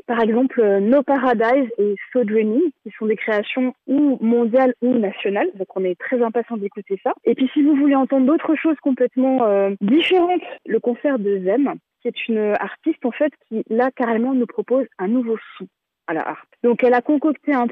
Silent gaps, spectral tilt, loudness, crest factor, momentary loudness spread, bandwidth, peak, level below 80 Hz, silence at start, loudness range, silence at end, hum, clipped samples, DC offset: none; -8.5 dB/octave; -19 LUFS; 12 dB; 9 LU; 4.7 kHz; -6 dBFS; -68 dBFS; 0.1 s; 4 LU; 0 s; none; under 0.1%; under 0.1%